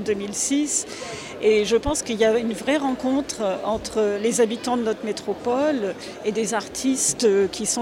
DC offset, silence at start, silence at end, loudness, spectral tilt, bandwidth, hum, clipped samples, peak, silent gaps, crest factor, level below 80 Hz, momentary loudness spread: under 0.1%; 0 s; 0 s; -22 LUFS; -3 dB/octave; 16 kHz; none; under 0.1%; -8 dBFS; none; 16 dB; -48 dBFS; 7 LU